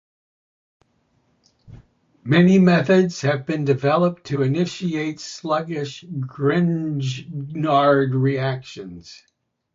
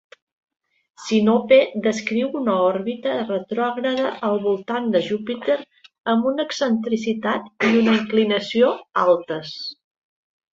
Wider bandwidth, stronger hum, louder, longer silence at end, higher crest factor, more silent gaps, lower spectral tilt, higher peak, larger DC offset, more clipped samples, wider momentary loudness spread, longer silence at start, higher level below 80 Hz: about the same, 7.6 kHz vs 7.8 kHz; neither; about the same, -20 LUFS vs -21 LUFS; second, 0.6 s vs 0.8 s; about the same, 18 dB vs 18 dB; second, none vs 6.00-6.04 s; first, -7 dB/octave vs -5.5 dB/octave; about the same, -2 dBFS vs -4 dBFS; neither; neither; first, 16 LU vs 8 LU; first, 1.7 s vs 1 s; first, -60 dBFS vs -66 dBFS